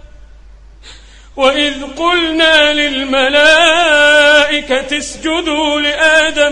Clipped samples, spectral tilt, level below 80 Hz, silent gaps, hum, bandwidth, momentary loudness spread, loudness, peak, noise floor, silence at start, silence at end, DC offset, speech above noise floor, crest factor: under 0.1%; -1.5 dB/octave; -38 dBFS; none; none; 11 kHz; 9 LU; -10 LUFS; 0 dBFS; -37 dBFS; 0.05 s; 0 s; under 0.1%; 26 dB; 12 dB